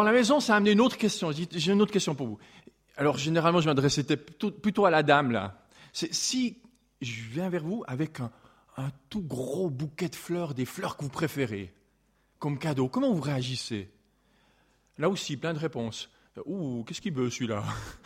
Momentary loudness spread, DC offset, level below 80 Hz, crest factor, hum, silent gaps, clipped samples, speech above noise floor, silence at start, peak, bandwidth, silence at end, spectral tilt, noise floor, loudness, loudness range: 15 LU; under 0.1%; -62 dBFS; 22 dB; none; none; under 0.1%; 41 dB; 0 s; -6 dBFS; 16 kHz; 0.1 s; -5 dB/octave; -69 dBFS; -29 LUFS; 8 LU